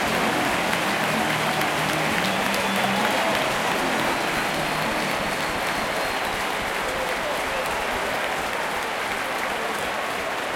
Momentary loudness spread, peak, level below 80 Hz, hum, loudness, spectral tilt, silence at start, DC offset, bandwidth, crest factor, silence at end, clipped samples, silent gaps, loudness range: 4 LU; -6 dBFS; -50 dBFS; none; -23 LUFS; -3 dB/octave; 0 s; under 0.1%; 17 kHz; 18 dB; 0 s; under 0.1%; none; 3 LU